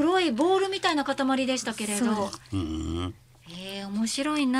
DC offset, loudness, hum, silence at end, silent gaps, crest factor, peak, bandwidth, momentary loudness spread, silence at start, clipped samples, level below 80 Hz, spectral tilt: under 0.1%; -27 LUFS; none; 0 s; none; 16 dB; -10 dBFS; 15.5 kHz; 12 LU; 0 s; under 0.1%; -52 dBFS; -4 dB/octave